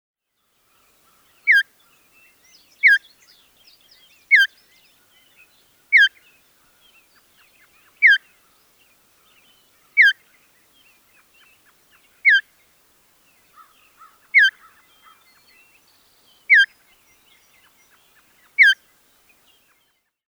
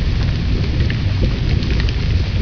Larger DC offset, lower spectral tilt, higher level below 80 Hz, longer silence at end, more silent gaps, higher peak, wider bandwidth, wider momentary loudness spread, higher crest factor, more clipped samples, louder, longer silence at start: neither; second, 3.5 dB/octave vs -7 dB/octave; second, -78 dBFS vs -20 dBFS; first, 1.65 s vs 0 s; neither; about the same, -4 dBFS vs -2 dBFS; first, over 20 kHz vs 5.4 kHz; first, 8 LU vs 1 LU; first, 20 dB vs 14 dB; neither; first, -15 LUFS vs -18 LUFS; first, 1.45 s vs 0 s